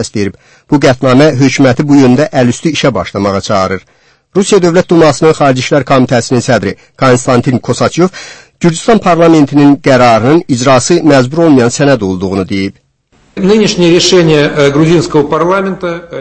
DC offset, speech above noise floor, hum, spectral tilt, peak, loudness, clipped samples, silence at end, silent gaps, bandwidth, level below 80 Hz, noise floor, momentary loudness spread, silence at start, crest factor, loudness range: under 0.1%; 41 dB; none; -5.5 dB/octave; 0 dBFS; -8 LUFS; 2%; 0 s; none; 10.5 kHz; -40 dBFS; -49 dBFS; 9 LU; 0 s; 8 dB; 3 LU